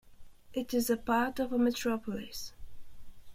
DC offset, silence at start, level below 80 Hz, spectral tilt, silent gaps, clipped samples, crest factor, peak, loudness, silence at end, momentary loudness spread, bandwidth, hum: under 0.1%; 0.05 s; -54 dBFS; -4 dB/octave; none; under 0.1%; 18 dB; -16 dBFS; -33 LUFS; 0 s; 13 LU; 16.5 kHz; none